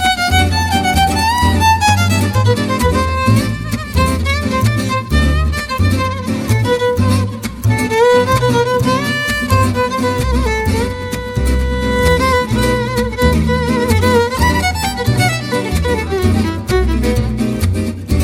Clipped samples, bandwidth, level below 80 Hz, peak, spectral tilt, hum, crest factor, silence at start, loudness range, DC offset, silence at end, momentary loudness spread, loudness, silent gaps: under 0.1%; 17 kHz; -22 dBFS; 0 dBFS; -5.5 dB/octave; none; 12 dB; 0 s; 2 LU; under 0.1%; 0 s; 6 LU; -14 LUFS; none